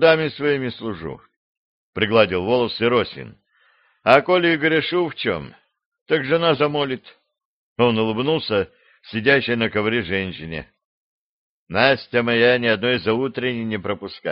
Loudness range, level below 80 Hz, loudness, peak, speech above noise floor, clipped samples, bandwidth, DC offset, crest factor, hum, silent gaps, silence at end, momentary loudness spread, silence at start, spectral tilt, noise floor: 3 LU; -56 dBFS; -20 LUFS; 0 dBFS; 40 dB; under 0.1%; 5.6 kHz; under 0.1%; 20 dB; none; 1.36-1.93 s, 5.86-5.92 s, 6.01-6.06 s, 7.45-7.76 s, 10.85-11.67 s; 0 s; 14 LU; 0 s; -3 dB/octave; -60 dBFS